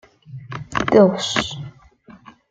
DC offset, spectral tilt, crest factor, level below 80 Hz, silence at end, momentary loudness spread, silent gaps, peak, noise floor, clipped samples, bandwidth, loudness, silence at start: under 0.1%; -5 dB/octave; 18 dB; -50 dBFS; 0.4 s; 25 LU; none; -2 dBFS; -47 dBFS; under 0.1%; 9.4 kHz; -18 LUFS; 0.3 s